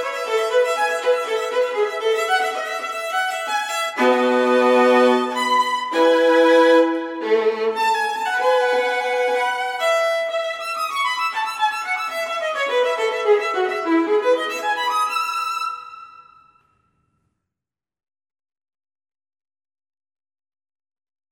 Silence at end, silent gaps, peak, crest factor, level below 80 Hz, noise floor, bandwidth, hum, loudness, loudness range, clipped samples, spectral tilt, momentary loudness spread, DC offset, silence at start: 5.1 s; none; -4 dBFS; 16 dB; -76 dBFS; -88 dBFS; 17 kHz; none; -19 LUFS; 7 LU; under 0.1%; -1.5 dB/octave; 9 LU; under 0.1%; 0 s